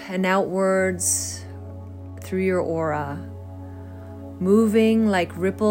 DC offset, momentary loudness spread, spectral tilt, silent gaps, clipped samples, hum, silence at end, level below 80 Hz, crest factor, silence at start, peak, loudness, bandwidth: under 0.1%; 20 LU; -5 dB/octave; none; under 0.1%; none; 0 s; -60 dBFS; 16 dB; 0 s; -6 dBFS; -21 LUFS; 16.5 kHz